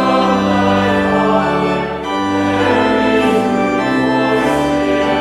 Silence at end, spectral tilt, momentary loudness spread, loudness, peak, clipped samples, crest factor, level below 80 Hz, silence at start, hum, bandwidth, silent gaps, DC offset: 0 s; -6 dB/octave; 3 LU; -14 LUFS; 0 dBFS; under 0.1%; 12 dB; -40 dBFS; 0 s; none; 14 kHz; none; under 0.1%